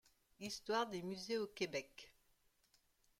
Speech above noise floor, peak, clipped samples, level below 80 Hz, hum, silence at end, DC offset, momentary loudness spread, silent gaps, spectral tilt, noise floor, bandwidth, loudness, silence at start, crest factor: 34 dB; -26 dBFS; under 0.1%; -78 dBFS; none; 1.1 s; under 0.1%; 18 LU; none; -3.5 dB/octave; -77 dBFS; 16.5 kHz; -44 LUFS; 0.4 s; 20 dB